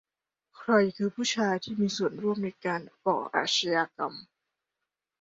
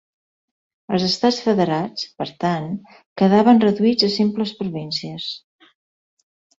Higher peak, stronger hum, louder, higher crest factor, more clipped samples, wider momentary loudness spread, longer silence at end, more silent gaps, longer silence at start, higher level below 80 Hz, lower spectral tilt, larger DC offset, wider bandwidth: second, -10 dBFS vs -2 dBFS; neither; second, -28 LUFS vs -19 LUFS; about the same, 20 dB vs 18 dB; neither; second, 9 LU vs 15 LU; second, 1 s vs 1.2 s; second, none vs 3.06-3.16 s; second, 0.55 s vs 0.9 s; second, -74 dBFS vs -62 dBFS; second, -4 dB/octave vs -6 dB/octave; neither; about the same, 7.8 kHz vs 7.8 kHz